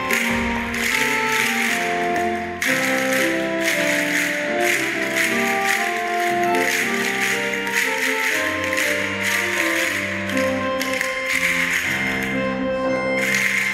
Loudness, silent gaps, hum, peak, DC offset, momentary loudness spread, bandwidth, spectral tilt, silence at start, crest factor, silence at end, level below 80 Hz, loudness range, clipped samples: -19 LUFS; none; none; -4 dBFS; under 0.1%; 4 LU; 16 kHz; -2.5 dB/octave; 0 s; 18 dB; 0 s; -48 dBFS; 1 LU; under 0.1%